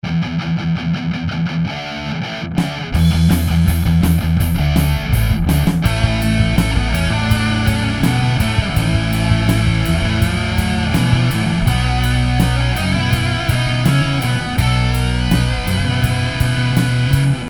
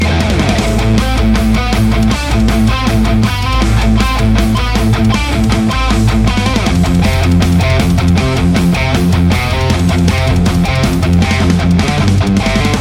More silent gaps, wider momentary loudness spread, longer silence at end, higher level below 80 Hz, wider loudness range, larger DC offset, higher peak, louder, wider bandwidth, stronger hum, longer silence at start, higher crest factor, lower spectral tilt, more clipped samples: neither; first, 5 LU vs 2 LU; about the same, 0 s vs 0 s; second, -24 dBFS vs -16 dBFS; about the same, 1 LU vs 1 LU; first, 0.7% vs under 0.1%; about the same, 0 dBFS vs 0 dBFS; second, -16 LUFS vs -12 LUFS; about the same, 18.5 kHz vs 17 kHz; neither; about the same, 0.05 s vs 0 s; about the same, 14 dB vs 10 dB; about the same, -6 dB/octave vs -6 dB/octave; neither